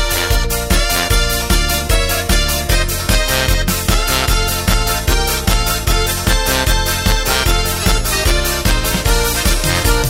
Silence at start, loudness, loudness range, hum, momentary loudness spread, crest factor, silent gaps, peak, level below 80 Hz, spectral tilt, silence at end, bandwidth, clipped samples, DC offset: 0 s; -15 LUFS; 0 LU; none; 1 LU; 14 dB; none; 0 dBFS; -18 dBFS; -3 dB/octave; 0 s; 16.5 kHz; under 0.1%; under 0.1%